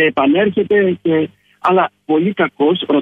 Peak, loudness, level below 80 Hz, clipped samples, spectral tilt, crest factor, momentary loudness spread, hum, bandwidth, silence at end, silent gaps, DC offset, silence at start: -2 dBFS; -15 LUFS; -58 dBFS; under 0.1%; -8.5 dB/octave; 12 dB; 4 LU; none; 4.7 kHz; 0 s; none; under 0.1%; 0 s